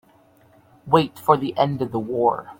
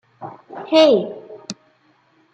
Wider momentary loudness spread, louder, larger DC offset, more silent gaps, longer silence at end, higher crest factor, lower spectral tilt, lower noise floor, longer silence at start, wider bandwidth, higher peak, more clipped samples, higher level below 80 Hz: second, 5 LU vs 24 LU; second, -21 LUFS vs -15 LUFS; neither; neither; second, 0.05 s vs 0.8 s; about the same, 22 dB vs 18 dB; first, -7.5 dB/octave vs -4.5 dB/octave; second, -55 dBFS vs -59 dBFS; first, 0.85 s vs 0.2 s; first, 17 kHz vs 8.6 kHz; about the same, -2 dBFS vs -2 dBFS; neither; first, -60 dBFS vs -74 dBFS